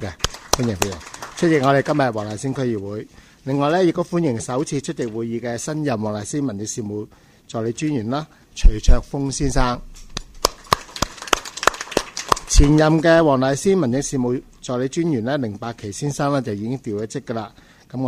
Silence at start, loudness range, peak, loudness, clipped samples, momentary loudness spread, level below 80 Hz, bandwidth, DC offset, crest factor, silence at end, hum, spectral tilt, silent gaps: 0 s; 7 LU; 0 dBFS; -21 LUFS; under 0.1%; 14 LU; -26 dBFS; 15.5 kHz; under 0.1%; 20 dB; 0 s; none; -5 dB/octave; none